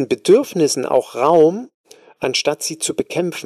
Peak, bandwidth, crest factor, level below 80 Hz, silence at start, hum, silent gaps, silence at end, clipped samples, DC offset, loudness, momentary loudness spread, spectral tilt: -4 dBFS; 14.5 kHz; 14 dB; -62 dBFS; 0 s; none; 1.74-1.84 s; 0 s; under 0.1%; under 0.1%; -17 LUFS; 9 LU; -4 dB/octave